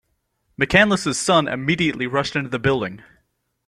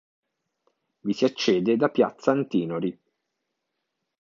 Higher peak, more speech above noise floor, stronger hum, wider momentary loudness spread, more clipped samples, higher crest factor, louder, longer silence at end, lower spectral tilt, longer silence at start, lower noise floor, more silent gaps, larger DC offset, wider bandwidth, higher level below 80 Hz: first, -2 dBFS vs -6 dBFS; second, 50 dB vs 57 dB; neither; about the same, 9 LU vs 9 LU; neither; about the same, 20 dB vs 20 dB; first, -19 LUFS vs -24 LUFS; second, 0.7 s vs 1.3 s; second, -4.5 dB/octave vs -6 dB/octave; second, 0.6 s vs 1.05 s; second, -69 dBFS vs -81 dBFS; neither; neither; first, 14 kHz vs 7.4 kHz; first, -48 dBFS vs -70 dBFS